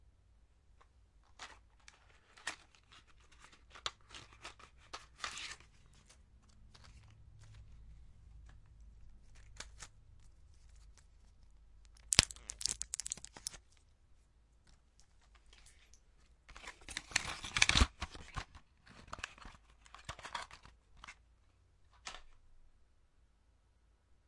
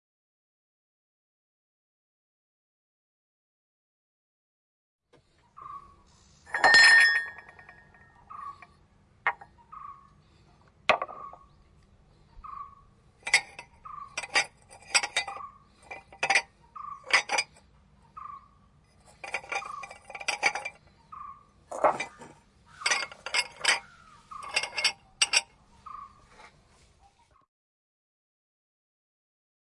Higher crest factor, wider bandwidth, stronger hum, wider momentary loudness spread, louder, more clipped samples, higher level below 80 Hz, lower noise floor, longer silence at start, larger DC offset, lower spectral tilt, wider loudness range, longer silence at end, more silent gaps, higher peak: first, 44 dB vs 30 dB; about the same, 11.5 kHz vs 11.5 kHz; neither; first, 31 LU vs 22 LU; second, -37 LUFS vs -25 LUFS; neither; first, -54 dBFS vs -66 dBFS; first, -71 dBFS vs -64 dBFS; second, 1.4 s vs 5.6 s; neither; first, -1.5 dB/octave vs 0.5 dB/octave; first, 22 LU vs 13 LU; second, 1.65 s vs 3.55 s; neither; about the same, -2 dBFS vs -4 dBFS